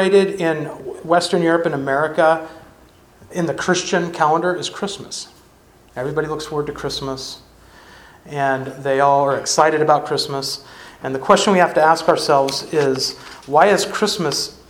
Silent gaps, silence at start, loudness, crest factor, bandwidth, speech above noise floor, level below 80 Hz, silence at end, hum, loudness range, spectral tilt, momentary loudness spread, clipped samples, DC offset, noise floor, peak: none; 0 s; -18 LUFS; 18 dB; 17.5 kHz; 32 dB; -54 dBFS; 0.15 s; none; 9 LU; -4 dB/octave; 15 LU; under 0.1%; under 0.1%; -49 dBFS; 0 dBFS